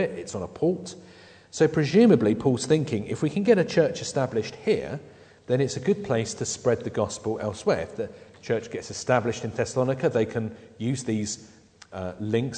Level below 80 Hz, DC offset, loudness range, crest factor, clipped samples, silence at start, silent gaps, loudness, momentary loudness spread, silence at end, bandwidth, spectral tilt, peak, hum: -60 dBFS; under 0.1%; 5 LU; 20 dB; under 0.1%; 0 s; none; -25 LUFS; 15 LU; 0 s; 9.4 kHz; -5.5 dB/octave; -6 dBFS; none